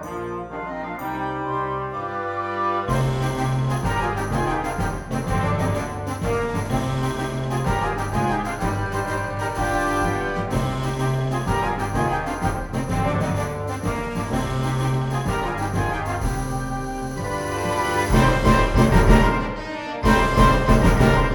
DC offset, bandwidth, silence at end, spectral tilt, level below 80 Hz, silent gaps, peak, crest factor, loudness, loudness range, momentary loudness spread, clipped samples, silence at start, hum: under 0.1%; 19 kHz; 0 s; -6 dB/octave; -28 dBFS; none; -2 dBFS; 18 dB; -23 LUFS; 6 LU; 10 LU; under 0.1%; 0 s; none